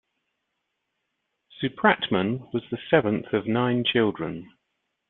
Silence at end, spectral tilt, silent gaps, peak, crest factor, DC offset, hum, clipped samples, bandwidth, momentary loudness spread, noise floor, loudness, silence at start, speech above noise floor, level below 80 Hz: 0.65 s; -9.5 dB/octave; none; -2 dBFS; 24 dB; under 0.1%; none; under 0.1%; 4.2 kHz; 10 LU; -79 dBFS; -24 LUFS; 1.6 s; 55 dB; -64 dBFS